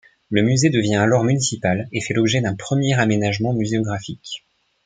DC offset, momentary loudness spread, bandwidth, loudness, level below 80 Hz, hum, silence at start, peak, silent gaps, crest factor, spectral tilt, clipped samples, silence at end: under 0.1%; 11 LU; 9.6 kHz; -19 LUFS; -54 dBFS; none; 0.3 s; -2 dBFS; none; 18 dB; -5 dB/octave; under 0.1%; 0.45 s